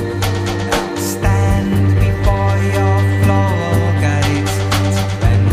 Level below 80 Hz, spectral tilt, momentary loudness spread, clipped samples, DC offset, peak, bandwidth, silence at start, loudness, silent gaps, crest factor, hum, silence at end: -26 dBFS; -6 dB/octave; 4 LU; under 0.1%; under 0.1%; -2 dBFS; 15.5 kHz; 0 s; -15 LUFS; none; 12 dB; none; 0 s